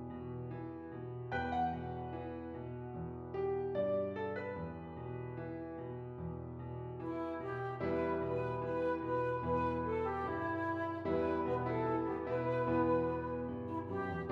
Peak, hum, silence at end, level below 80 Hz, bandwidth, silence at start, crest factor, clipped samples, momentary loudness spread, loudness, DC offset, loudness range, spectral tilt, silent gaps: -22 dBFS; none; 0 s; -62 dBFS; 6.8 kHz; 0 s; 16 dB; under 0.1%; 10 LU; -39 LUFS; under 0.1%; 6 LU; -9.5 dB/octave; none